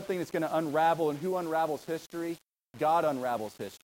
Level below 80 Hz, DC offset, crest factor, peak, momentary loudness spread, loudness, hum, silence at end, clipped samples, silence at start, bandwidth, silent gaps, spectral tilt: -74 dBFS; under 0.1%; 16 dB; -16 dBFS; 10 LU; -31 LUFS; none; 0.05 s; under 0.1%; 0 s; 17 kHz; none; -5.5 dB/octave